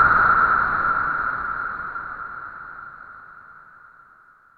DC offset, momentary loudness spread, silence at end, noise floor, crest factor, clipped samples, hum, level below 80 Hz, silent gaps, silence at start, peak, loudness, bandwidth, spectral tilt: under 0.1%; 25 LU; 1.05 s; -53 dBFS; 18 dB; under 0.1%; none; -48 dBFS; none; 0 s; -6 dBFS; -20 LUFS; 4.9 kHz; -7 dB/octave